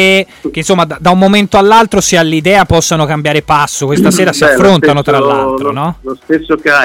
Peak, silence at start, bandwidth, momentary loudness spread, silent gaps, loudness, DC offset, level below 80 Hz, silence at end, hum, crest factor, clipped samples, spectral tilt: 0 dBFS; 0 s; 17 kHz; 8 LU; none; -9 LUFS; under 0.1%; -34 dBFS; 0 s; none; 8 dB; under 0.1%; -4.5 dB/octave